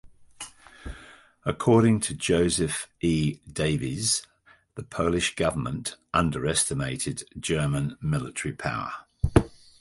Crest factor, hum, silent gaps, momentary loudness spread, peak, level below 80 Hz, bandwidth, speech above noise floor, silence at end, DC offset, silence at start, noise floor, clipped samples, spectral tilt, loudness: 24 dB; none; none; 19 LU; -4 dBFS; -42 dBFS; 11.5 kHz; 25 dB; 0.3 s; under 0.1%; 0.05 s; -51 dBFS; under 0.1%; -4.5 dB/octave; -26 LUFS